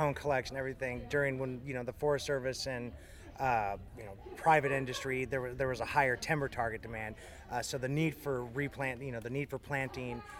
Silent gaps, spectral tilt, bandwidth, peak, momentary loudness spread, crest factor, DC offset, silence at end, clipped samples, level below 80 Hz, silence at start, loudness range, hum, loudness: none; -5 dB/octave; 17.5 kHz; -14 dBFS; 11 LU; 22 dB; under 0.1%; 0 s; under 0.1%; -56 dBFS; 0 s; 4 LU; none; -35 LUFS